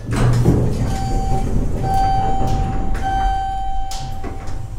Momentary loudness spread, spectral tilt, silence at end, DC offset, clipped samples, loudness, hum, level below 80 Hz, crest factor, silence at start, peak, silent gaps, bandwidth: 12 LU; -6.5 dB/octave; 0 s; under 0.1%; under 0.1%; -20 LUFS; none; -22 dBFS; 14 dB; 0 s; -2 dBFS; none; 13 kHz